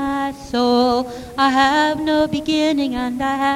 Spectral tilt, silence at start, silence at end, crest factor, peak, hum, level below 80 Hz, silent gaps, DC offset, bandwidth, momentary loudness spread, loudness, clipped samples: -4.5 dB/octave; 0 s; 0 s; 16 dB; -2 dBFS; none; -44 dBFS; none; under 0.1%; 15.5 kHz; 7 LU; -18 LUFS; under 0.1%